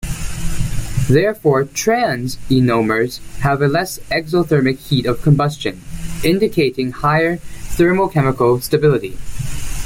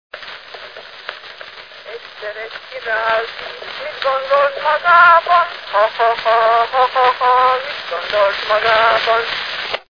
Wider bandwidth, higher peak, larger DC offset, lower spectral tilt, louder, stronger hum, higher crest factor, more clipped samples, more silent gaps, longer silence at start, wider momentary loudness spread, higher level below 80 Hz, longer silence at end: first, 16.5 kHz vs 5.4 kHz; about the same, -2 dBFS vs 0 dBFS; second, under 0.1% vs 0.2%; first, -6 dB/octave vs -2.5 dB/octave; second, -17 LUFS vs -14 LUFS; neither; about the same, 14 dB vs 16 dB; neither; neither; second, 0 s vs 0.15 s; second, 11 LU vs 20 LU; first, -30 dBFS vs -56 dBFS; about the same, 0 s vs 0.1 s